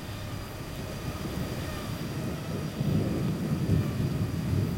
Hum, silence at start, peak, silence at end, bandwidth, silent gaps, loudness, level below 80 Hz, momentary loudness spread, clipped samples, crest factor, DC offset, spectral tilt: none; 0 s; -14 dBFS; 0 s; 16.5 kHz; none; -32 LUFS; -44 dBFS; 10 LU; under 0.1%; 16 dB; under 0.1%; -6.5 dB/octave